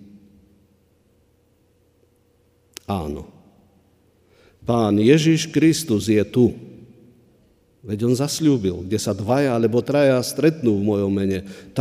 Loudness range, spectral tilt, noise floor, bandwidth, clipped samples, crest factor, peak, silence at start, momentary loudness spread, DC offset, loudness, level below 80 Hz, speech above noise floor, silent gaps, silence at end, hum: 16 LU; -6 dB/octave; -60 dBFS; 15.5 kHz; under 0.1%; 20 dB; -2 dBFS; 2.9 s; 14 LU; under 0.1%; -20 LUFS; -52 dBFS; 42 dB; none; 0 s; none